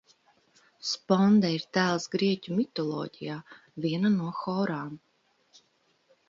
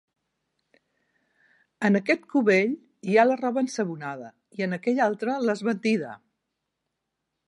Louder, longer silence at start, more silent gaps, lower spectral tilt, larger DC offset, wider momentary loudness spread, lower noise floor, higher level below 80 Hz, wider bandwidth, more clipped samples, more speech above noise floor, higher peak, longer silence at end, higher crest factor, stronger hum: second, -28 LUFS vs -25 LUFS; second, 0.85 s vs 1.8 s; neither; about the same, -6 dB/octave vs -6 dB/octave; neither; about the same, 16 LU vs 14 LU; second, -70 dBFS vs -82 dBFS; first, -72 dBFS vs -80 dBFS; second, 7.6 kHz vs 11.5 kHz; neither; second, 42 dB vs 58 dB; second, -10 dBFS vs -6 dBFS; about the same, 1.3 s vs 1.3 s; about the same, 20 dB vs 20 dB; neither